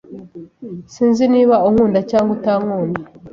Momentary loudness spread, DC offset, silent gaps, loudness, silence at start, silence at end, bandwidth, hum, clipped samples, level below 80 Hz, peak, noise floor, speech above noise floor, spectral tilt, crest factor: 21 LU; under 0.1%; none; -15 LUFS; 0.1 s; 0.05 s; 7.4 kHz; none; under 0.1%; -50 dBFS; -2 dBFS; -35 dBFS; 20 dB; -7.5 dB/octave; 14 dB